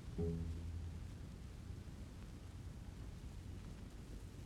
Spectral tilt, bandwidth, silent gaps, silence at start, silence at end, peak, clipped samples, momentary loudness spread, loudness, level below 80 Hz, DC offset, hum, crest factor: -7 dB/octave; 14 kHz; none; 0 s; 0 s; -32 dBFS; under 0.1%; 10 LU; -50 LUFS; -52 dBFS; under 0.1%; none; 18 dB